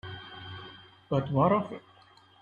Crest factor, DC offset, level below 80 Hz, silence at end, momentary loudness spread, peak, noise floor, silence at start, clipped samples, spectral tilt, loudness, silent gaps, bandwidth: 20 dB; under 0.1%; -62 dBFS; 0.6 s; 20 LU; -12 dBFS; -58 dBFS; 0.05 s; under 0.1%; -9 dB/octave; -28 LUFS; none; 7 kHz